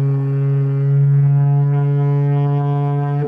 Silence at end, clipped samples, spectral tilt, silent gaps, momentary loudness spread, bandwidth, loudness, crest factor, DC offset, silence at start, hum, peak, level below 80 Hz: 0 s; under 0.1%; -12 dB/octave; none; 4 LU; 3.2 kHz; -16 LUFS; 6 dB; under 0.1%; 0 s; none; -8 dBFS; -60 dBFS